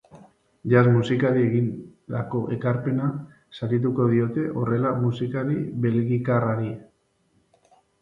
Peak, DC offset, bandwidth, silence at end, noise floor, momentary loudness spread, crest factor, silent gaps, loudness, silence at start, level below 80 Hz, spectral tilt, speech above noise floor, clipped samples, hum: -6 dBFS; under 0.1%; 7.6 kHz; 1.2 s; -66 dBFS; 13 LU; 18 dB; none; -24 LUFS; 0.15 s; -60 dBFS; -9.5 dB/octave; 44 dB; under 0.1%; none